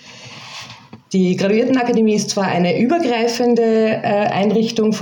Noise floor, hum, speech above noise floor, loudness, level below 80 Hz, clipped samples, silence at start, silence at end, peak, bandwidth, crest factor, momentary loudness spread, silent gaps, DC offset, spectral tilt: -38 dBFS; none; 23 dB; -16 LUFS; -64 dBFS; under 0.1%; 0.05 s; 0 s; -4 dBFS; 17 kHz; 12 dB; 17 LU; none; under 0.1%; -5.5 dB/octave